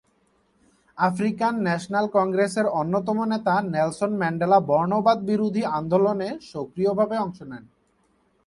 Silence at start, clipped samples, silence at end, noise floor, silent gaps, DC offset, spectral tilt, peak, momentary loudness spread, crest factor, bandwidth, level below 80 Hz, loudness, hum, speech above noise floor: 0.95 s; under 0.1%; 0.85 s; -65 dBFS; none; under 0.1%; -7 dB/octave; -6 dBFS; 9 LU; 18 dB; 11.5 kHz; -62 dBFS; -23 LUFS; none; 43 dB